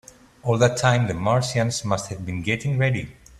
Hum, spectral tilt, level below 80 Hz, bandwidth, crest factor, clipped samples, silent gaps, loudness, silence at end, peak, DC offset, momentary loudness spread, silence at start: none; -5 dB/octave; -50 dBFS; 12.5 kHz; 20 dB; under 0.1%; none; -23 LUFS; 0.3 s; -4 dBFS; under 0.1%; 9 LU; 0.45 s